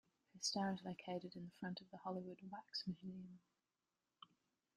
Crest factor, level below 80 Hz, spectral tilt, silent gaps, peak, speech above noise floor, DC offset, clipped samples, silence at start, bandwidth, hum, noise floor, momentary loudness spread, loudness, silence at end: 20 dB; -84 dBFS; -4 dB/octave; none; -30 dBFS; over 42 dB; under 0.1%; under 0.1%; 0.35 s; 12 kHz; none; under -90 dBFS; 23 LU; -48 LUFS; 0.5 s